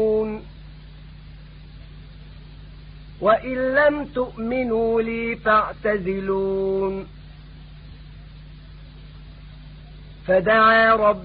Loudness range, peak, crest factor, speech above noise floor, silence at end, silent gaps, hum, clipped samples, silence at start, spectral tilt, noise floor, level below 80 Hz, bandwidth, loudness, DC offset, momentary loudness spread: 11 LU; -4 dBFS; 20 dB; 22 dB; 0 s; none; none; under 0.1%; 0 s; -10 dB/octave; -41 dBFS; -42 dBFS; 5.2 kHz; -20 LUFS; under 0.1%; 28 LU